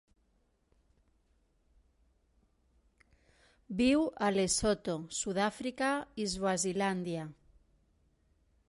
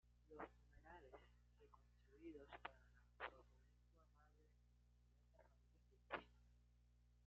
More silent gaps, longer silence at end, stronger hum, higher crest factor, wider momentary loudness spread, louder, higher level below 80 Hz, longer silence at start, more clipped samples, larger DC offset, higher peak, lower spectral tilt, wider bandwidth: neither; first, 1.4 s vs 0 s; second, none vs 60 Hz at -75 dBFS; second, 20 dB vs 30 dB; about the same, 9 LU vs 11 LU; first, -33 LUFS vs -60 LUFS; first, -60 dBFS vs -74 dBFS; first, 3.7 s vs 0.05 s; neither; neither; first, -16 dBFS vs -34 dBFS; about the same, -4 dB/octave vs -3 dB/octave; first, 11.5 kHz vs 6.4 kHz